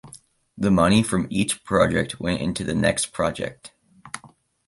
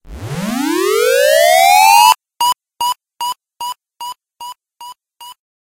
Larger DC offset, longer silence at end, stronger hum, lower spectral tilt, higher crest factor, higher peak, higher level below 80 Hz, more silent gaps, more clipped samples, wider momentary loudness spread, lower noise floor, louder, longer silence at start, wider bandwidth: neither; about the same, 0.4 s vs 0.45 s; neither; first, -5 dB/octave vs -2 dB/octave; about the same, 18 dB vs 14 dB; second, -4 dBFS vs 0 dBFS; about the same, -44 dBFS vs -46 dBFS; neither; neither; second, 17 LU vs 22 LU; first, -53 dBFS vs -38 dBFS; second, -22 LUFS vs -12 LUFS; about the same, 0.05 s vs 0.05 s; second, 11.5 kHz vs 17 kHz